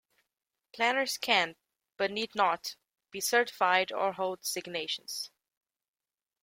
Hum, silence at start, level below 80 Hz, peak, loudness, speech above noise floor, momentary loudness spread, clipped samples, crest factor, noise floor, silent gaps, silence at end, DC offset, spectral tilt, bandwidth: none; 0.75 s; -78 dBFS; -10 dBFS; -30 LUFS; over 59 dB; 11 LU; under 0.1%; 22 dB; under -90 dBFS; none; 1.15 s; under 0.1%; -1.5 dB/octave; 16.5 kHz